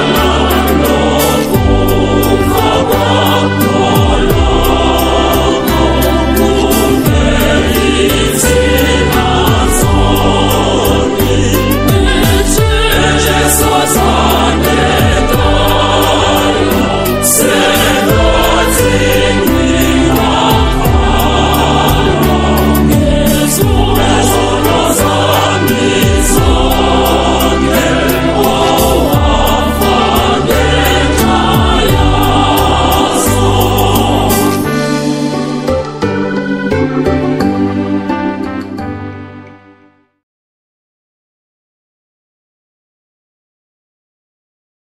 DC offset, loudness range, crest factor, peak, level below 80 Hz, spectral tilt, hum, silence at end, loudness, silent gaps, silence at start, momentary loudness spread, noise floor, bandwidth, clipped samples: 0.6%; 4 LU; 10 dB; 0 dBFS; -18 dBFS; -4.5 dB/octave; none; 5.4 s; -10 LUFS; none; 0 s; 4 LU; -47 dBFS; 16.5 kHz; 0.2%